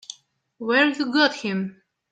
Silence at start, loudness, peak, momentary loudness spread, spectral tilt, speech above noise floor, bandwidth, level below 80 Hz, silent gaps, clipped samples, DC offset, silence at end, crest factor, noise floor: 0.1 s; -21 LUFS; -6 dBFS; 15 LU; -4.5 dB/octave; 27 dB; 9 kHz; -74 dBFS; none; under 0.1%; under 0.1%; 0.4 s; 20 dB; -49 dBFS